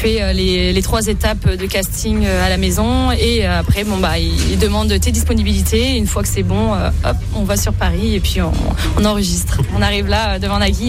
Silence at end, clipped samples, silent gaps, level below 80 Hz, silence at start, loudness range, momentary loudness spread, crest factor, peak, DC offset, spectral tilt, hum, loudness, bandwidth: 0 s; under 0.1%; none; -20 dBFS; 0 s; 1 LU; 3 LU; 14 dB; -2 dBFS; under 0.1%; -5 dB/octave; none; -16 LUFS; 16 kHz